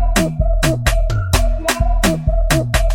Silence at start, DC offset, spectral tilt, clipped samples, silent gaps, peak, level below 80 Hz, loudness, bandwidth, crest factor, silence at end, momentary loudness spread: 0 s; under 0.1%; -4.5 dB/octave; under 0.1%; none; -2 dBFS; -16 dBFS; -17 LUFS; 17 kHz; 14 dB; 0 s; 2 LU